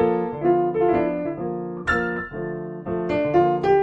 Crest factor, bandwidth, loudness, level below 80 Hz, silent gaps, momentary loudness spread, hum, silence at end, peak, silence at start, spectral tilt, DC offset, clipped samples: 16 dB; 7.8 kHz; -23 LUFS; -46 dBFS; none; 10 LU; none; 0 s; -6 dBFS; 0 s; -8 dB/octave; under 0.1%; under 0.1%